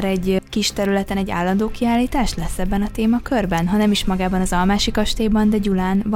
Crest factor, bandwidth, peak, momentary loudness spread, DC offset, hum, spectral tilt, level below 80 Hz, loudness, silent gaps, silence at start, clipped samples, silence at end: 14 dB; 16.5 kHz; -4 dBFS; 5 LU; under 0.1%; none; -5.5 dB/octave; -30 dBFS; -19 LUFS; none; 0 s; under 0.1%; 0 s